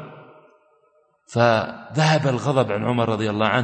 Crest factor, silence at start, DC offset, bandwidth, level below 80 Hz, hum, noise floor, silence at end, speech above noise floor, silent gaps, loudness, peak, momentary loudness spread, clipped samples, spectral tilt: 18 dB; 0 s; under 0.1%; 8.8 kHz; -60 dBFS; none; -62 dBFS; 0 s; 42 dB; none; -21 LUFS; -4 dBFS; 8 LU; under 0.1%; -6 dB/octave